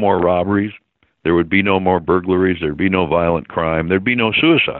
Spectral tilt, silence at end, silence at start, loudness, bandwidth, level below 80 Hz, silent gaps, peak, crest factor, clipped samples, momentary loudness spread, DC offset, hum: -4 dB/octave; 0 s; 0 s; -16 LUFS; 4.2 kHz; -46 dBFS; none; 0 dBFS; 16 dB; under 0.1%; 5 LU; under 0.1%; none